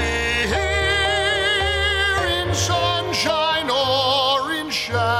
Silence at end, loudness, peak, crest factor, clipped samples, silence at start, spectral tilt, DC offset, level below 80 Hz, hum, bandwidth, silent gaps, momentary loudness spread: 0 s; -19 LUFS; -8 dBFS; 12 dB; under 0.1%; 0 s; -3 dB/octave; under 0.1%; -34 dBFS; none; 16 kHz; none; 3 LU